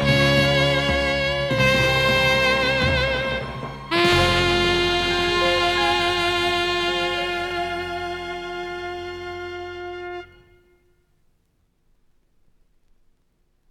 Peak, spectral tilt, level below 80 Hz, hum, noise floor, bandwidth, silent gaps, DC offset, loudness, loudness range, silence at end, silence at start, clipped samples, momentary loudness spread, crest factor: -4 dBFS; -4.5 dB/octave; -40 dBFS; none; -66 dBFS; 16 kHz; none; under 0.1%; -20 LUFS; 17 LU; 3.45 s; 0 s; under 0.1%; 15 LU; 18 dB